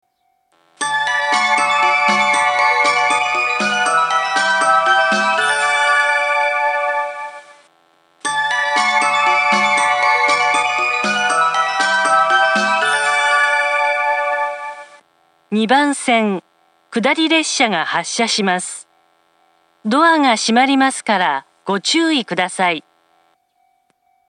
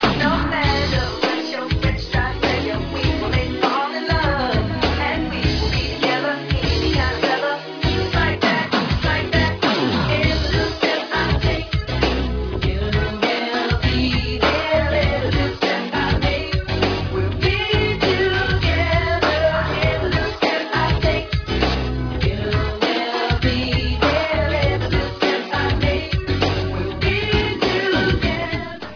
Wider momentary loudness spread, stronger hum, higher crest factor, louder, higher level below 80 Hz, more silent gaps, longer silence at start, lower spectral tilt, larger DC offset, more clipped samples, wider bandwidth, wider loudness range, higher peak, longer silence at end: first, 8 LU vs 4 LU; neither; about the same, 16 dB vs 18 dB; first, -15 LUFS vs -19 LUFS; second, -78 dBFS vs -28 dBFS; neither; first, 0.8 s vs 0 s; second, -2 dB/octave vs -6 dB/octave; neither; neither; first, 11.5 kHz vs 5.4 kHz; about the same, 4 LU vs 2 LU; about the same, 0 dBFS vs -2 dBFS; first, 1.5 s vs 0 s